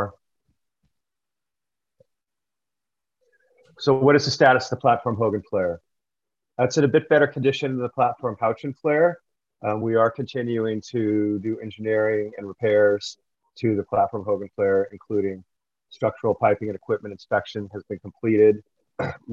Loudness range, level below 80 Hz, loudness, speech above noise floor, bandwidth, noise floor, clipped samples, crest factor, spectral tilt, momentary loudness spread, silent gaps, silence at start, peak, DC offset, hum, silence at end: 4 LU; -58 dBFS; -23 LUFS; 67 dB; 7.6 kHz; -89 dBFS; under 0.1%; 20 dB; -6 dB/octave; 13 LU; none; 0 s; -4 dBFS; under 0.1%; none; 0 s